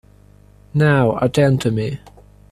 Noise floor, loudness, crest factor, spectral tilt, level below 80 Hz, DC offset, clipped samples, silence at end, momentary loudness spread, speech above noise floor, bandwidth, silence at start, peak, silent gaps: -47 dBFS; -17 LUFS; 16 dB; -7 dB/octave; -46 dBFS; under 0.1%; under 0.1%; 0.55 s; 11 LU; 32 dB; 13 kHz; 0.75 s; -2 dBFS; none